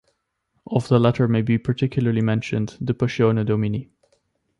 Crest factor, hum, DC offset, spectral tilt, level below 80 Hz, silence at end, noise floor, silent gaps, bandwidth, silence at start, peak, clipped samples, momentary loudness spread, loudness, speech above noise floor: 18 dB; none; under 0.1%; -8 dB/octave; -52 dBFS; 0.75 s; -72 dBFS; none; 10.5 kHz; 0.7 s; -4 dBFS; under 0.1%; 8 LU; -21 LUFS; 52 dB